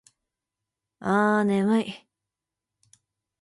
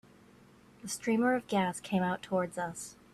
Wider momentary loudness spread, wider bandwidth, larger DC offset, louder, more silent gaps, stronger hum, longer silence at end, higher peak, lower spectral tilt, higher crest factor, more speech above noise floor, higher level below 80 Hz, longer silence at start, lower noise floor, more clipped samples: first, 14 LU vs 11 LU; second, 11.5 kHz vs 14 kHz; neither; first, -24 LUFS vs -32 LUFS; neither; neither; first, 1.45 s vs 0.2 s; first, -10 dBFS vs -18 dBFS; first, -7 dB/octave vs -5 dB/octave; about the same, 18 dB vs 16 dB; first, 65 dB vs 27 dB; about the same, -70 dBFS vs -68 dBFS; first, 1 s vs 0.85 s; first, -87 dBFS vs -59 dBFS; neither